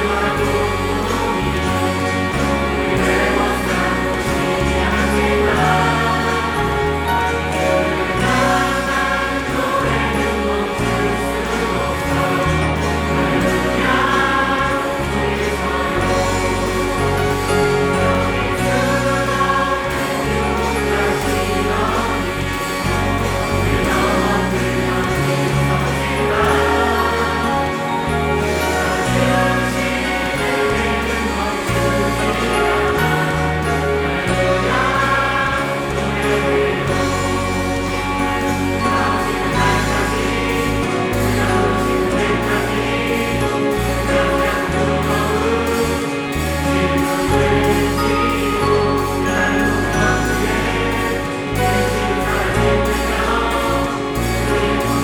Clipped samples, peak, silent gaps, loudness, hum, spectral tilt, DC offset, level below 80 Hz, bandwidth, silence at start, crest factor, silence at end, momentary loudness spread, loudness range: under 0.1%; -2 dBFS; none; -17 LUFS; none; -5 dB/octave; under 0.1%; -30 dBFS; 19 kHz; 0 s; 14 dB; 0 s; 4 LU; 1 LU